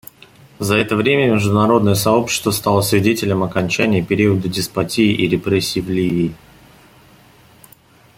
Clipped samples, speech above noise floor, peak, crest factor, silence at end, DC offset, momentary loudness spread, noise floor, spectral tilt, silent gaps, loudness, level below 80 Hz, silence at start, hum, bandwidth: under 0.1%; 33 dB; -2 dBFS; 16 dB; 1.8 s; under 0.1%; 5 LU; -48 dBFS; -5 dB/octave; none; -16 LUFS; -48 dBFS; 0.6 s; none; 16.5 kHz